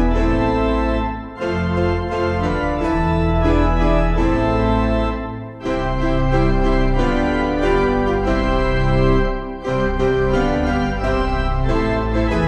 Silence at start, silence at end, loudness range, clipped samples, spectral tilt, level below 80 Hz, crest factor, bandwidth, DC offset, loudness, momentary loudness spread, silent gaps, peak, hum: 0 s; 0 s; 1 LU; under 0.1%; -7.5 dB/octave; -22 dBFS; 14 dB; 8.4 kHz; under 0.1%; -19 LUFS; 6 LU; none; -4 dBFS; none